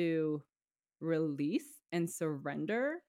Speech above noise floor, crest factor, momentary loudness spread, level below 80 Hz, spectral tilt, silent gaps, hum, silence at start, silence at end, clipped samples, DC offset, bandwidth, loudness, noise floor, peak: over 55 dB; 14 dB; 6 LU; -86 dBFS; -6 dB/octave; none; none; 0 s; 0.1 s; under 0.1%; under 0.1%; 16 kHz; -37 LUFS; under -90 dBFS; -22 dBFS